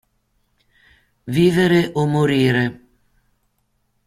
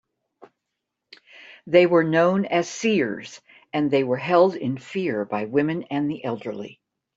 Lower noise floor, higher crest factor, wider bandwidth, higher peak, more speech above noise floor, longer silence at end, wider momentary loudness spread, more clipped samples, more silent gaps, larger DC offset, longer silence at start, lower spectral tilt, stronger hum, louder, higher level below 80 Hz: second, -67 dBFS vs -82 dBFS; about the same, 18 dB vs 20 dB; first, 15 kHz vs 8 kHz; about the same, -4 dBFS vs -2 dBFS; second, 51 dB vs 60 dB; first, 1.35 s vs 0.45 s; second, 9 LU vs 15 LU; neither; neither; neither; first, 1.25 s vs 0.4 s; about the same, -7 dB/octave vs -6 dB/octave; neither; first, -17 LUFS vs -22 LUFS; first, -52 dBFS vs -68 dBFS